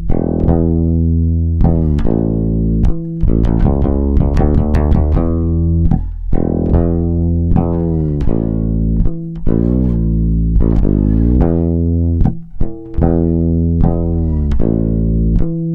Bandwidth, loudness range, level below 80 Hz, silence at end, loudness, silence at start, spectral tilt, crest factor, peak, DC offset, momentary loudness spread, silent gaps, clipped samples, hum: 3.8 kHz; 1 LU; -16 dBFS; 0 s; -15 LUFS; 0 s; -12 dB/octave; 12 dB; 0 dBFS; under 0.1%; 4 LU; none; under 0.1%; none